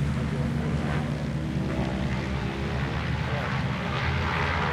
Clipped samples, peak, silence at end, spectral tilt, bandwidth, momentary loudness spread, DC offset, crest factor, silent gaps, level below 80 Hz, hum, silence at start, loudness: under 0.1%; -14 dBFS; 0 s; -6.5 dB/octave; 11.5 kHz; 3 LU; under 0.1%; 14 dB; none; -36 dBFS; none; 0 s; -28 LUFS